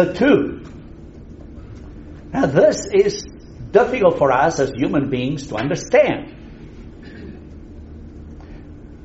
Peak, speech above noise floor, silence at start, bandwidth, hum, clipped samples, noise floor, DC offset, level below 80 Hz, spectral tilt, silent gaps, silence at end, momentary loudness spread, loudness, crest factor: -2 dBFS; 21 dB; 0 s; 8 kHz; none; under 0.1%; -38 dBFS; under 0.1%; -40 dBFS; -5.5 dB/octave; none; 0 s; 24 LU; -17 LUFS; 18 dB